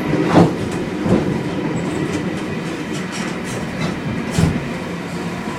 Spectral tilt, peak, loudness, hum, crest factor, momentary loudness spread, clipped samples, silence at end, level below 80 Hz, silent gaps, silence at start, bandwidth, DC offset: -6.5 dB/octave; 0 dBFS; -20 LUFS; none; 20 dB; 10 LU; under 0.1%; 0 s; -40 dBFS; none; 0 s; 15 kHz; under 0.1%